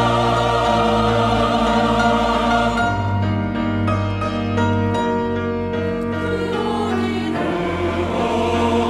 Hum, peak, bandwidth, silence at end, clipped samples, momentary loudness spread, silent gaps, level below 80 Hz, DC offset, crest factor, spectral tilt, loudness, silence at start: none; -4 dBFS; 12 kHz; 0 s; under 0.1%; 5 LU; none; -36 dBFS; under 0.1%; 14 dB; -6.5 dB/octave; -19 LUFS; 0 s